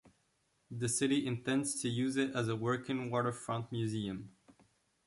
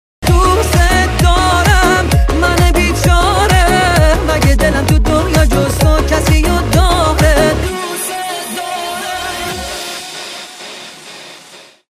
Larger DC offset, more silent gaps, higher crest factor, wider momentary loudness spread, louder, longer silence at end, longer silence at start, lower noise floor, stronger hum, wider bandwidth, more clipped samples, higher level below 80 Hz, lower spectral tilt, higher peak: neither; neither; first, 18 dB vs 12 dB; second, 8 LU vs 14 LU; second, -35 LUFS vs -12 LUFS; first, 0.55 s vs 0.3 s; second, 0.05 s vs 0.2 s; first, -77 dBFS vs -39 dBFS; neither; second, 12 kHz vs 16 kHz; neither; second, -70 dBFS vs -16 dBFS; about the same, -5 dB/octave vs -4.5 dB/octave; second, -20 dBFS vs 0 dBFS